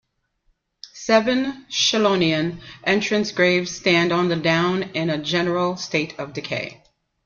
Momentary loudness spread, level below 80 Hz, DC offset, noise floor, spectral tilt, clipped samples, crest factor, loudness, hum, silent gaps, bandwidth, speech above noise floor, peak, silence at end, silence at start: 10 LU; -58 dBFS; under 0.1%; -67 dBFS; -4.5 dB/octave; under 0.1%; 18 dB; -20 LUFS; none; none; 7.4 kHz; 46 dB; -4 dBFS; 0.5 s; 0.85 s